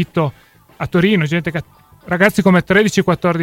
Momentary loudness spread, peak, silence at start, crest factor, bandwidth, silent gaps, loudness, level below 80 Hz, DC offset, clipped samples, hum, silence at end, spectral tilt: 11 LU; 0 dBFS; 0 s; 16 dB; 16 kHz; none; -15 LUFS; -46 dBFS; under 0.1%; under 0.1%; none; 0 s; -6 dB/octave